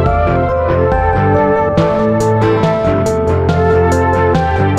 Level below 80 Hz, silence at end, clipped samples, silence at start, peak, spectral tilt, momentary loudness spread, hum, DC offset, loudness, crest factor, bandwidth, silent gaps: -24 dBFS; 0 s; under 0.1%; 0 s; -2 dBFS; -7.5 dB/octave; 2 LU; none; under 0.1%; -12 LUFS; 10 dB; 11.5 kHz; none